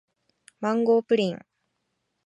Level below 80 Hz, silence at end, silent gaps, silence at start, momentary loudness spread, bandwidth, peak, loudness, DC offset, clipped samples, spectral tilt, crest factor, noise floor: -78 dBFS; 0.9 s; none; 0.6 s; 10 LU; 10.5 kHz; -10 dBFS; -24 LUFS; under 0.1%; under 0.1%; -6.5 dB/octave; 16 dB; -77 dBFS